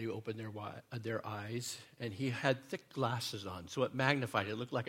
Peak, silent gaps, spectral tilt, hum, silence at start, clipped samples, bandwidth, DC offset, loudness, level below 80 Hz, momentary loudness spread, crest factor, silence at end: -14 dBFS; none; -5 dB/octave; none; 0 s; under 0.1%; 16.5 kHz; under 0.1%; -38 LUFS; -76 dBFS; 11 LU; 26 dB; 0 s